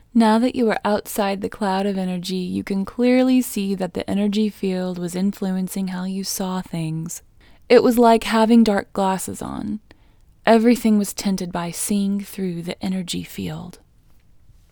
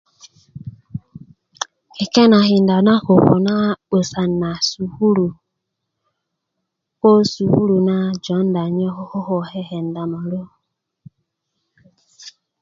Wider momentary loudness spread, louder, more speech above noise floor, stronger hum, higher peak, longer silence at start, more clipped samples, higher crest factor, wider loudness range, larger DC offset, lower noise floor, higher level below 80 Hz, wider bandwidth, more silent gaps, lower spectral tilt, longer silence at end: second, 13 LU vs 16 LU; second, -20 LUFS vs -17 LUFS; second, 32 dB vs 61 dB; neither; about the same, 0 dBFS vs 0 dBFS; about the same, 0.15 s vs 0.25 s; neither; about the same, 20 dB vs 18 dB; second, 6 LU vs 11 LU; neither; second, -52 dBFS vs -77 dBFS; about the same, -50 dBFS vs -54 dBFS; first, over 20 kHz vs 7.6 kHz; neither; about the same, -5.5 dB/octave vs -6.5 dB/octave; first, 1 s vs 0.3 s